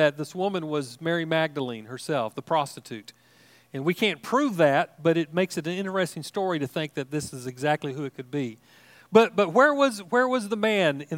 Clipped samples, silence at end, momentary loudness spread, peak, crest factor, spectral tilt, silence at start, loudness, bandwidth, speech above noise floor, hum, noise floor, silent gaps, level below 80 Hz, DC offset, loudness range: under 0.1%; 0 s; 13 LU; -4 dBFS; 22 dB; -5 dB/octave; 0 s; -25 LUFS; 16.5 kHz; 32 dB; none; -57 dBFS; none; -74 dBFS; under 0.1%; 6 LU